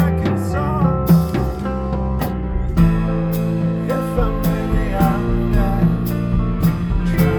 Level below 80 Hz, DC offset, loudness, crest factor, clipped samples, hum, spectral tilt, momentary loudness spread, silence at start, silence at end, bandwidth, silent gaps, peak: -24 dBFS; 0.2%; -19 LUFS; 14 dB; under 0.1%; none; -8.5 dB/octave; 6 LU; 0 s; 0 s; over 20 kHz; none; -2 dBFS